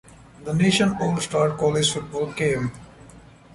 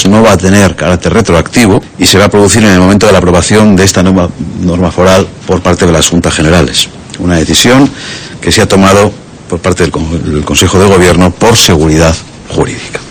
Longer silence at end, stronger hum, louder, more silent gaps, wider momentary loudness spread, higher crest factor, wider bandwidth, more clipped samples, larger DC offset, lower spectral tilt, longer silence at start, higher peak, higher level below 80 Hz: first, 0.35 s vs 0 s; neither; second, -22 LUFS vs -6 LUFS; neither; about the same, 9 LU vs 9 LU; first, 16 dB vs 6 dB; second, 11.5 kHz vs over 20 kHz; second, under 0.1% vs 5%; neither; about the same, -4.5 dB/octave vs -4.5 dB/octave; first, 0.4 s vs 0 s; second, -8 dBFS vs 0 dBFS; second, -50 dBFS vs -24 dBFS